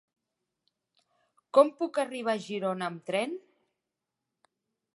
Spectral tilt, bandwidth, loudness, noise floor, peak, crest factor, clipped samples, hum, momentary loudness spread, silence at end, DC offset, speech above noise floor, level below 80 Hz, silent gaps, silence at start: -5 dB/octave; 11.5 kHz; -29 LUFS; -87 dBFS; -8 dBFS; 24 dB; under 0.1%; none; 11 LU; 1.55 s; under 0.1%; 59 dB; -88 dBFS; none; 1.55 s